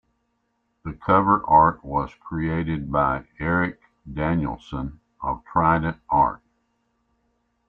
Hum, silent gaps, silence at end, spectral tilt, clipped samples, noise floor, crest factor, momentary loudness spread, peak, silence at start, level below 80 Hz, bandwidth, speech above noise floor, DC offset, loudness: none; none; 1.3 s; -9.5 dB/octave; under 0.1%; -72 dBFS; 20 dB; 15 LU; -4 dBFS; 0.85 s; -44 dBFS; 4.7 kHz; 50 dB; under 0.1%; -23 LUFS